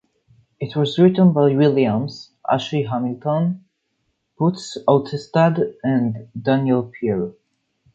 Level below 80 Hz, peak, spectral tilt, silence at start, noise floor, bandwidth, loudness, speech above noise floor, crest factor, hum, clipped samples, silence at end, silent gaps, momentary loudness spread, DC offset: -60 dBFS; -2 dBFS; -8 dB/octave; 0.6 s; -71 dBFS; 8 kHz; -19 LUFS; 53 dB; 18 dB; none; under 0.1%; 0.65 s; none; 11 LU; under 0.1%